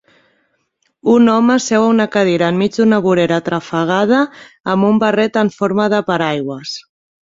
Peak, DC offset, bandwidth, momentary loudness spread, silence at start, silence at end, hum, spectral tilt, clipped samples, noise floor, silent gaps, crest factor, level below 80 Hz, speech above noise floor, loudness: -2 dBFS; under 0.1%; 7.8 kHz; 10 LU; 1.05 s; 0.4 s; none; -5.5 dB/octave; under 0.1%; -65 dBFS; 4.60-4.64 s; 14 dB; -56 dBFS; 51 dB; -14 LUFS